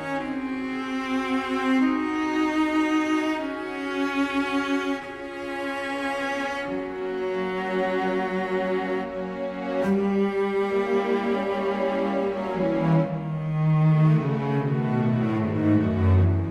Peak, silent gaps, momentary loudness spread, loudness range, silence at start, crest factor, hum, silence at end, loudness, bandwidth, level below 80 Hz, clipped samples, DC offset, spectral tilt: -10 dBFS; none; 8 LU; 4 LU; 0 s; 14 dB; none; 0 s; -25 LUFS; 11 kHz; -56 dBFS; under 0.1%; under 0.1%; -7.5 dB/octave